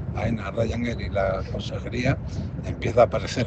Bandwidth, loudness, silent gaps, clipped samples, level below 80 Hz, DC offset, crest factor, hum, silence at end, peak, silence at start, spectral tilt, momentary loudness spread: 8.6 kHz; -25 LUFS; none; under 0.1%; -38 dBFS; under 0.1%; 20 dB; none; 0 s; -4 dBFS; 0 s; -6.5 dB/octave; 10 LU